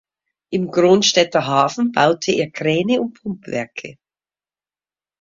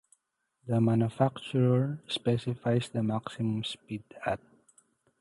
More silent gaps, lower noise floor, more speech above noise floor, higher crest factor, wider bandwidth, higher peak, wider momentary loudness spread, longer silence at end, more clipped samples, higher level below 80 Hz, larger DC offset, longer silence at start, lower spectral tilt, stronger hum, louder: neither; first, under -90 dBFS vs -78 dBFS; first, over 73 dB vs 49 dB; about the same, 20 dB vs 18 dB; second, 7.6 kHz vs 11.5 kHz; first, 0 dBFS vs -12 dBFS; first, 15 LU vs 10 LU; first, 1.3 s vs 0.85 s; neither; about the same, -60 dBFS vs -64 dBFS; neither; second, 0.5 s vs 0.65 s; second, -4 dB/octave vs -7.5 dB/octave; first, 50 Hz at -45 dBFS vs none; first, -17 LUFS vs -30 LUFS